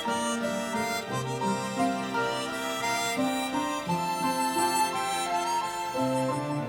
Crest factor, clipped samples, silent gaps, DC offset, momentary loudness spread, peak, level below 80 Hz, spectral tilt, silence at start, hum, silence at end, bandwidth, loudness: 16 dB; under 0.1%; none; under 0.1%; 4 LU; -14 dBFS; -64 dBFS; -3.5 dB/octave; 0 s; none; 0 s; over 20 kHz; -29 LUFS